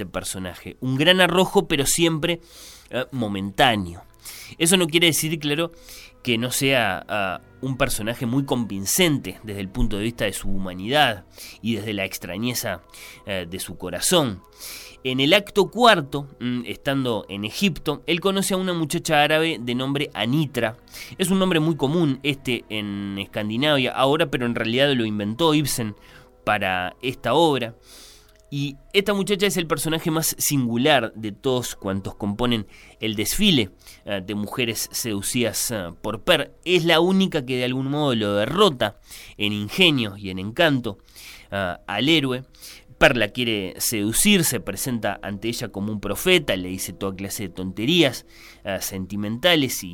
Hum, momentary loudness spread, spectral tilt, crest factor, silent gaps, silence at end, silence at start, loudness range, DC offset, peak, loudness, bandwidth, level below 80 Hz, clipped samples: none; 14 LU; -4 dB/octave; 20 dB; none; 0 s; 0 s; 3 LU; under 0.1%; -2 dBFS; -22 LUFS; 17.5 kHz; -42 dBFS; under 0.1%